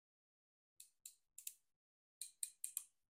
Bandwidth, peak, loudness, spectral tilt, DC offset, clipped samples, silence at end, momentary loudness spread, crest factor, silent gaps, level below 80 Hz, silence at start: 16 kHz; -22 dBFS; -51 LUFS; 5.5 dB/octave; under 0.1%; under 0.1%; 0.3 s; 17 LU; 36 dB; 1.76-2.21 s; under -90 dBFS; 0.8 s